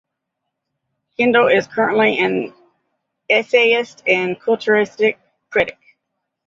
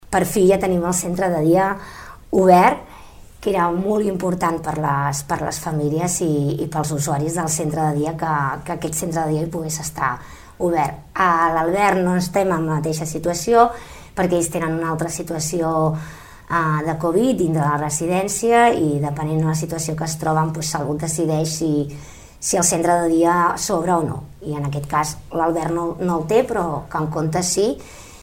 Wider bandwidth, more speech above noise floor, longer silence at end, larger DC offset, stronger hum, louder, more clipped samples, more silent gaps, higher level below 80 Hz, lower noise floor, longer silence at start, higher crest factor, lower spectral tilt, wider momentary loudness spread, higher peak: second, 7.6 kHz vs 16.5 kHz; first, 62 dB vs 21 dB; first, 0.75 s vs 0 s; neither; neither; first, -16 LUFS vs -20 LUFS; neither; neither; second, -60 dBFS vs -44 dBFS; first, -78 dBFS vs -41 dBFS; first, 1.2 s vs 0.1 s; about the same, 18 dB vs 20 dB; about the same, -5 dB/octave vs -5 dB/octave; about the same, 9 LU vs 8 LU; about the same, -2 dBFS vs 0 dBFS